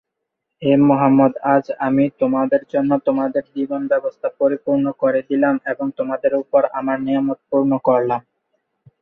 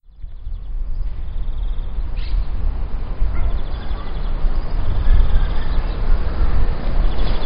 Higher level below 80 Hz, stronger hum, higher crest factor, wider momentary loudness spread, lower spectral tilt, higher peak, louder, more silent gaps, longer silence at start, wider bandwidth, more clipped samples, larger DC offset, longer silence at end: second, -62 dBFS vs -18 dBFS; neither; about the same, 16 dB vs 16 dB; about the same, 9 LU vs 9 LU; about the same, -10 dB/octave vs -11 dB/octave; about the same, -2 dBFS vs 0 dBFS; first, -18 LUFS vs -25 LUFS; neither; first, 0.6 s vs 0.2 s; second, 3.9 kHz vs 5.2 kHz; neither; neither; first, 0.8 s vs 0 s